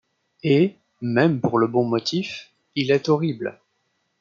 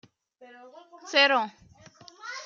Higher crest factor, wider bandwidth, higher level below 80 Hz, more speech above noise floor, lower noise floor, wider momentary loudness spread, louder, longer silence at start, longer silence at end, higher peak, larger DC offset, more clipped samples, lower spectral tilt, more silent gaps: about the same, 18 dB vs 22 dB; about the same, 7.6 kHz vs 7.6 kHz; first, -66 dBFS vs -74 dBFS; first, 51 dB vs 26 dB; first, -71 dBFS vs -53 dBFS; second, 12 LU vs 23 LU; about the same, -22 LUFS vs -23 LUFS; about the same, 0.45 s vs 0.4 s; first, 0.7 s vs 0 s; first, -4 dBFS vs -8 dBFS; neither; neither; first, -6.5 dB/octave vs -1.5 dB/octave; neither